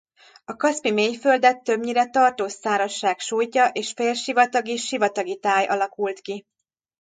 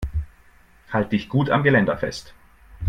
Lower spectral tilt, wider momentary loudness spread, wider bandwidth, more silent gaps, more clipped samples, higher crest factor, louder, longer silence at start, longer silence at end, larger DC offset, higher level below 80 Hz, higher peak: second, -2.5 dB/octave vs -7 dB/octave; second, 9 LU vs 15 LU; second, 9.4 kHz vs 10.5 kHz; neither; neither; about the same, 18 dB vs 20 dB; about the same, -22 LUFS vs -22 LUFS; first, 0.5 s vs 0 s; first, 0.6 s vs 0 s; neither; second, -72 dBFS vs -38 dBFS; about the same, -4 dBFS vs -4 dBFS